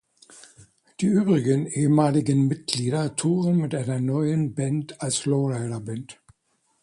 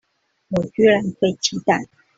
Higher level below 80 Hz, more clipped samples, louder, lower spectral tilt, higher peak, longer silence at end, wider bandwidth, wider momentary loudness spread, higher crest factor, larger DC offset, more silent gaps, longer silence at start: second, -62 dBFS vs -56 dBFS; neither; second, -23 LUFS vs -19 LUFS; first, -6 dB/octave vs -4.5 dB/octave; about the same, -4 dBFS vs -4 dBFS; first, 0.7 s vs 0.35 s; first, 11.5 kHz vs 7.8 kHz; about the same, 9 LU vs 8 LU; about the same, 20 dB vs 16 dB; neither; neither; second, 0.35 s vs 0.5 s